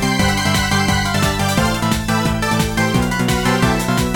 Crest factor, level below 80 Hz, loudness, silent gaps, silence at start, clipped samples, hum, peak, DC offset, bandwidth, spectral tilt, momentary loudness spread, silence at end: 14 dB; -30 dBFS; -16 LUFS; none; 0 s; under 0.1%; none; -2 dBFS; 0.3%; 19.5 kHz; -4.5 dB/octave; 2 LU; 0 s